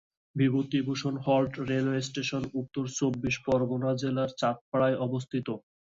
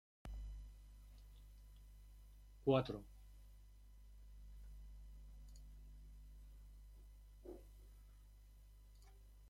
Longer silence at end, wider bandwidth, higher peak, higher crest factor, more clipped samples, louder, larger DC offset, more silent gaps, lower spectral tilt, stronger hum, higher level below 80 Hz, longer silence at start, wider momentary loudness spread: first, 0.35 s vs 0 s; second, 7.8 kHz vs 16.5 kHz; first, -14 dBFS vs -22 dBFS; second, 16 dB vs 28 dB; neither; first, -29 LUFS vs -46 LUFS; neither; first, 4.61-4.72 s vs none; second, -6 dB/octave vs -7.5 dB/octave; second, none vs 50 Hz at -60 dBFS; about the same, -60 dBFS vs -58 dBFS; about the same, 0.35 s vs 0.25 s; second, 7 LU vs 19 LU